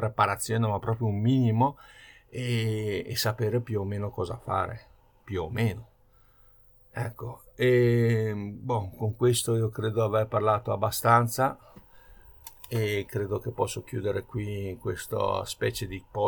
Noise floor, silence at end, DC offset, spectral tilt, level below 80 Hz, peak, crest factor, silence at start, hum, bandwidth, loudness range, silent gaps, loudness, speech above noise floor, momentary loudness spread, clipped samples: -60 dBFS; 0 s; under 0.1%; -6 dB/octave; -56 dBFS; -6 dBFS; 22 dB; 0 s; none; over 20 kHz; 7 LU; none; -28 LUFS; 33 dB; 13 LU; under 0.1%